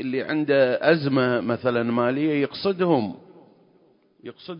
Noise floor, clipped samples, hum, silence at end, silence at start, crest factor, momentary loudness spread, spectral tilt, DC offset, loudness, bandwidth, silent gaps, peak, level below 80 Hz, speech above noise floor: -59 dBFS; under 0.1%; none; 0 s; 0 s; 18 dB; 18 LU; -11 dB/octave; under 0.1%; -22 LUFS; 5.4 kHz; none; -6 dBFS; -66 dBFS; 37 dB